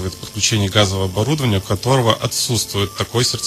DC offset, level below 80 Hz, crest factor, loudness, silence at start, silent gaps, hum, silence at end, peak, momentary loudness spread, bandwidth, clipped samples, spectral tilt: under 0.1%; -44 dBFS; 18 dB; -17 LUFS; 0 s; none; none; 0 s; 0 dBFS; 5 LU; 14.5 kHz; under 0.1%; -4 dB/octave